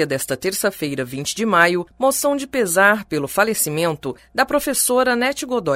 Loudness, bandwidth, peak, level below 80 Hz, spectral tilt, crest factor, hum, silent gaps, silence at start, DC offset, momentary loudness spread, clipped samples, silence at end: -19 LUFS; 16 kHz; 0 dBFS; -52 dBFS; -3 dB/octave; 18 dB; none; none; 0 s; under 0.1%; 9 LU; under 0.1%; 0 s